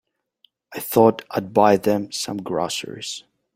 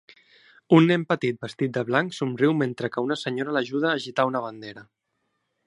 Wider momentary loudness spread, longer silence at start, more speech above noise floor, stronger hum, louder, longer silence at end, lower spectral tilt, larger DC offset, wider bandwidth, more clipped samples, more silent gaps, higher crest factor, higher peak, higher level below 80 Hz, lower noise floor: first, 15 LU vs 10 LU; about the same, 0.7 s vs 0.7 s; second, 42 dB vs 52 dB; neither; first, -21 LUFS vs -24 LUFS; second, 0.35 s vs 0.85 s; second, -4.5 dB/octave vs -6.5 dB/octave; neither; first, 16.5 kHz vs 11 kHz; neither; neither; about the same, 20 dB vs 20 dB; about the same, -2 dBFS vs -4 dBFS; first, -60 dBFS vs -72 dBFS; second, -62 dBFS vs -76 dBFS